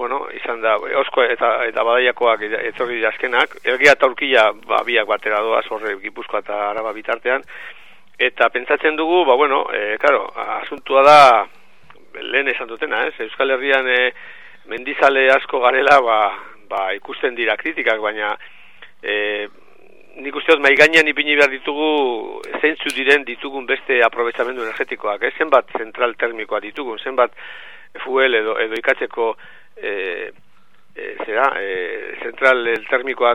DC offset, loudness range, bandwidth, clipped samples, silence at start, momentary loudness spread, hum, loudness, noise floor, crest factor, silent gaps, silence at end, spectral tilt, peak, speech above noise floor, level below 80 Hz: 0.9%; 7 LU; 14.5 kHz; under 0.1%; 0 s; 15 LU; none; -17 LUFS; -57 dBFS; 18 dB; none; 0 s; -3 dB/octave; 0 dBFS; 40 dB; -64 dBFS